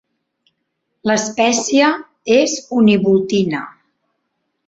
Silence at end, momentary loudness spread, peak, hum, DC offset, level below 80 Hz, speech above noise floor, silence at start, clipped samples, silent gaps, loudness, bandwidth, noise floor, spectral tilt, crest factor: 0.95 s; 11 LU; -2 dBFS; none; under 0.1%; -58 dBFS; 58 dB; 1.05 s; under 0.1%; none; -15 LUFS; 8.2 kHz; -72 dBFS; -4 dB/octave; 16 dB